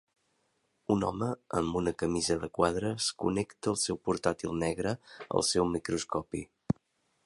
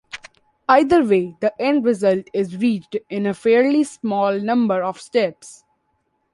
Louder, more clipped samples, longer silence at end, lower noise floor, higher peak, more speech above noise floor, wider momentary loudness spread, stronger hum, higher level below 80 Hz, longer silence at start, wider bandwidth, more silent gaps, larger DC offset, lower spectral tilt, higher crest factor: second, -32 LUFS vs -19 LUFS; neither; second, 0.55 s vs 0.8 s; first, -75 dBFS vs -69 dBFS; second, -10 dBFS vs -2 dBFS; second, 44 dB vs 50 dB; second, 7 LU vs 10 LU; neither; about the same, -54 dBFS vs -58 dBFS; first, 0.9 s vs 0.15 s; about the same, 11.5 kHz vs 11.5 kHz; neither; neither; second, -4.5 dB/octave vs -6 dB/octave; about the same, 22 dB vs 18 dB